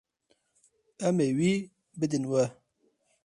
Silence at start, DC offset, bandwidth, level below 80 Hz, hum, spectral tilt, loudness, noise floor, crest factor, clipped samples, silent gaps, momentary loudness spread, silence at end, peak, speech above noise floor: 1 s; under 0.1%; 11.5 kHz; -70 dBFS; none; -6.5 dB/octave; -29 LUFS; -73 dBFS; 18 dB; under 0.1%; none; 7 LU; 0.7 s; -14 dBFS; 46 dB